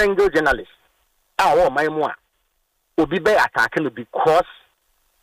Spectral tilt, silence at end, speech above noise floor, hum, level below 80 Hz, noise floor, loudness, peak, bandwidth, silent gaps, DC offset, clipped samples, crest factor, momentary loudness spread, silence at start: -5 dB/octave; 0.7 s; 51 dB; none; -46 dBFS; -69 dBFS; -19 LUFS; -4 dBFS; 15.5 kHz; none; under 0.1%; under 0.1%; 16 dB; 10 LU; 0 s